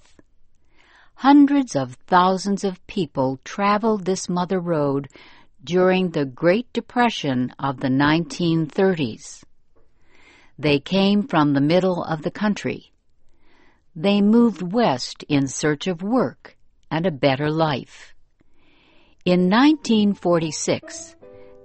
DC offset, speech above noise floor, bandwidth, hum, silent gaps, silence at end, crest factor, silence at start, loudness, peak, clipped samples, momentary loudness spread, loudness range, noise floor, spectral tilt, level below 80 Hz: under 0.1%; 33 dB; 8.8 kHz; none; none; 0.2 s; 18 dB; 1.2 s; -20 LUFS; -2 dBFS; under 0.1%; 10 LU; 3 LU; -53 dBFS; -5.5 dB/octave; -54 dBFS